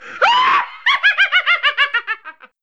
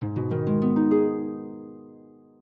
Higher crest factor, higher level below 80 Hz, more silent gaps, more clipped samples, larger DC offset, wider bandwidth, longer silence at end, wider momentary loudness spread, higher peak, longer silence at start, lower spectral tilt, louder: about the same, 14 dB vs 14 dB; second, -72 dBFS vs -64 dBFS; neither; neither; first, 0.3% vs under 0.1%; first, 8.8 kHz vs 4.2 kHz; about the same, 0.3 s vs 0.4 s; second, 8 LU vs 19 LU; first, -2 dBFS vs -12 dBFS; about the same, 0 s vs 0 s; second, 0.5 dB/octave vs -12 dB/octave; first, -14 LUFS vs -24 LUFS